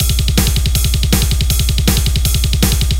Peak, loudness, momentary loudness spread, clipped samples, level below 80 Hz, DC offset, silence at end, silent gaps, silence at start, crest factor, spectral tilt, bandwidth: 0 dBFS; -14 LUFS; 1 LU; under 0.1%; -16 dBFS; under 0.1%; 0 s; none; 0 s; 12 dB; -4 dB/octave; 17 kHz